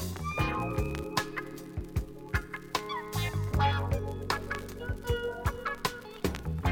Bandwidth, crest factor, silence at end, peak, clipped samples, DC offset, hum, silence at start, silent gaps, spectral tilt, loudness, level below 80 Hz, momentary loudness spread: 17.5 kHz; 20 dB; 0 s; -12 dBFS; under 0.1%; under 0.1%; none; 0 s; none; -5 dB/octave; -33 LUFS; -40 dBFS; 8 LU